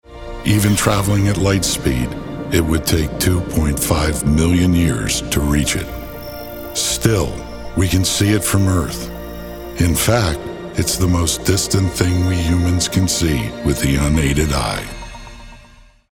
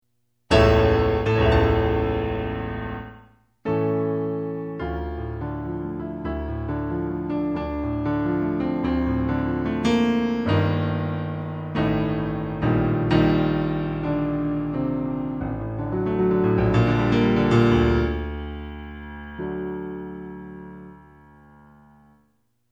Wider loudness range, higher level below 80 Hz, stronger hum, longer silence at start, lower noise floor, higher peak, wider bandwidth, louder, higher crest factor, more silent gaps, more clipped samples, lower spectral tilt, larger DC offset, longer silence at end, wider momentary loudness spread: second, 2 LU vs 8 LU; first, -28 dBFS vs -34 dBFS; neither; second, 0.1 s vs 0.5 s; second, -45 dBFS vs -68 dBFS; about the same, -2 dBFS vs -4 dBFS; first, 18.5 kHz vs 8.8 kHz; first, -17 LUFS vs -23 LUFS; about the same, 16 dB vs 18 dB; neither; neither; second, -4.5 dB/octave vs -8 dB/octave; neither; second, 0.55 s vs 1.75 s; about the same, 14 LU vs 15 LU